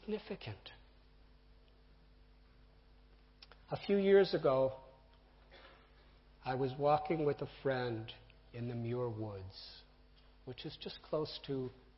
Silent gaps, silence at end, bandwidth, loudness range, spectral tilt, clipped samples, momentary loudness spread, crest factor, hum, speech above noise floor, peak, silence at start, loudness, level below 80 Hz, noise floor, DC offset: none; 0.25 s; 5.8 kHz; 10 LU; -5 dB/octave; under 0.1%; 22 LU; 22 dB; none; 27 dB; -18 dBFS; 0.05 s; -37 LUFS; -64 dBFS; -63 dBFS; under 0.1%